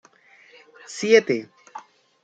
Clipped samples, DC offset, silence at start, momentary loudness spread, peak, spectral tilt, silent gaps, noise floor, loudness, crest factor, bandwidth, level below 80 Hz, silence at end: under 0.1%; under 0.1%; 0.9 s; 25 LU; -2 dBFS; -3.5 dB/octave; none; -54 dBFS; -20 LUFS; 22 dB; 9 kHz; -76 dBFS; 0.45 s